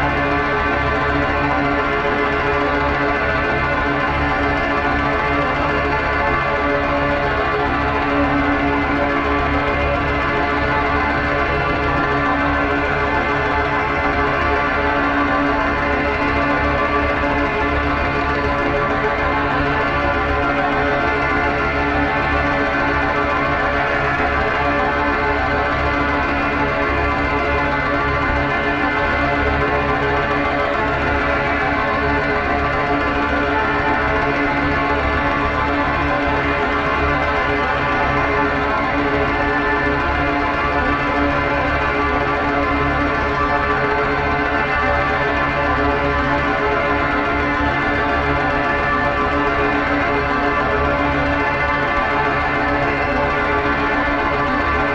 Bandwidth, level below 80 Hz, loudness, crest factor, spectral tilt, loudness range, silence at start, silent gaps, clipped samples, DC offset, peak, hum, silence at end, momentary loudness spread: 8.2 kHz; -30 dBFS; -17 LUFS; 14 dB; -6.5 dB/octave; 0 LU; 0 s; none; under 0.1%; under 0.1%; -4 dBFS; none; 0 s; 1 LU